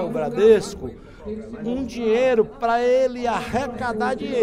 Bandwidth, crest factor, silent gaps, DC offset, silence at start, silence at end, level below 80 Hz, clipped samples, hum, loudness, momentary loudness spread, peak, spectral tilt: 11.5 kHz; 18 dB; none; under 0.1%; 0 s; 0 s; -46 dBFS; under 0.1%; none; -21 LUFS; 17 LU; -4 dBFS; -5.5 dB/octave